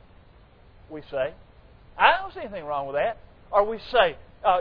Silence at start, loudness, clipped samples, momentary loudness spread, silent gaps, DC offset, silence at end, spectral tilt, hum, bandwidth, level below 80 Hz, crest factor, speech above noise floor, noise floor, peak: 0.9 s; -25 LUFS; under 0.1%; 20 LU; none; under 0.1%; 0 s; -6 dB/octave; none; 5.4 kHz; -52 dBFS; 24 dB; 27 dB; -53 dBFS; -2 dBFS